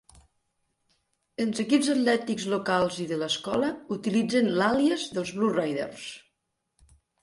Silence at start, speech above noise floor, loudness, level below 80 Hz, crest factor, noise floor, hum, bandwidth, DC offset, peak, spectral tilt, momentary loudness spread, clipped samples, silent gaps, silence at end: 1.4 s; 54 dB; -26 LUFS; -64 dBFS; 18 dB; -80 dBFS; none; 11.5 kHz; under 0.1%; -10 dBFS; -4.5 dB/octave; 9 LU; under 0.1%; none; 1.05 s